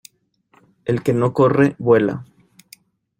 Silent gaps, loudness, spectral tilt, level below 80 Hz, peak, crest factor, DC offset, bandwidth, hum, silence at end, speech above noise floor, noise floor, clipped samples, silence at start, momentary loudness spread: none; -17 LUFS; -8 dB/octave; -58 dBFS; -2 dBFS; 18 dB; under 0.1%; 16.5 kHz; none; 0.95 s; 45 dB; -61 dBFS; under 0.1%; 0.85 s; 12 LU